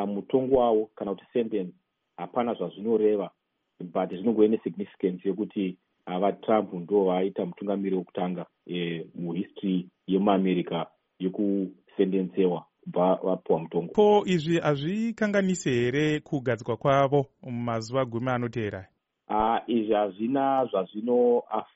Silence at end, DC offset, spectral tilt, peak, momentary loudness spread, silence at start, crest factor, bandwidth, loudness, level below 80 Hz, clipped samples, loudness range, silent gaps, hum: 0.1 s; under 0.1%; -6 dB/octave; -8 dBFS; 11 LU; 0 s; 20 dB; 8 kHz; -27 LUFS; -60 dBFS; under 0.1%; 4 LU; none; none